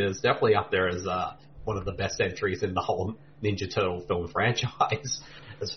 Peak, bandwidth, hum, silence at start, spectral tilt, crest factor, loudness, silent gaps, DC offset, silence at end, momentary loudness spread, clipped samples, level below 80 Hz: -10 dBFS; 6.6 kHz; none; 0 s; -4.5 dB/octave; 18 dB; -28 LUFS; none; 0.2%; 0 s; 10 LU; under 0.1%; -52 dBFS